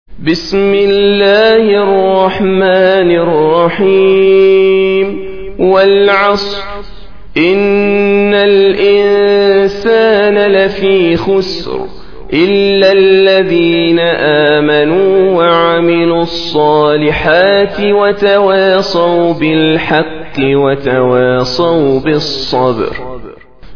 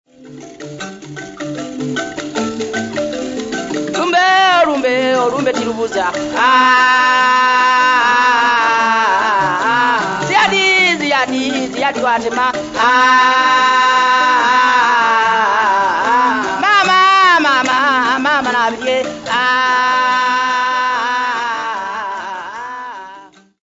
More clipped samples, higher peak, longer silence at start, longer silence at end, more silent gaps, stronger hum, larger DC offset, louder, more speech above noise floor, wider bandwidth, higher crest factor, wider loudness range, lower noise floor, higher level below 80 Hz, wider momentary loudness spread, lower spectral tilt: first, 0.2% vs under 0.1%; about the same, 0 dBFS vs 0 dBFS; second, 0.05 s vs 0.2 s; second, 0 s vs 0.35 s; neither; neither; first, 3% vs under 0.1%; first, -9 LUFS vs -13 LUFS; about the same, 24 dB vs 27 dB; second, 5.4 kHz vs 8 kHz; about the same, 10 dB vs 14 dB; second, 2 LU vs 6 LU; second, -32 dBFS vs -39 dBFS; first, -38 dBFS vs -54 dBFS; second, 8 LU vs 13 LU; first, -6.5 dB/octave vs -2.5 dB/octave